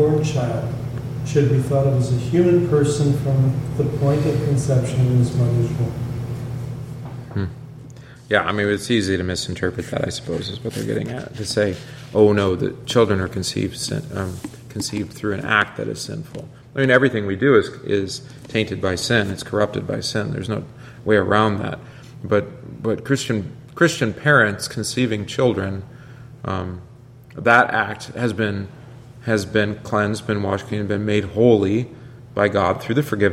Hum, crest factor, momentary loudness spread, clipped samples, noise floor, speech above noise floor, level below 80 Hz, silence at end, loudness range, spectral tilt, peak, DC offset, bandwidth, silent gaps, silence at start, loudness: none; 20 dB; 15 LU; under 0.1%; -40 dBFS; 20 dB; -46 dBFS; 0 s; 5 LU; -6 dB/octave; 0 dBFS; under 0.1%; 15 kHz; none; 0 s; -20 LUFS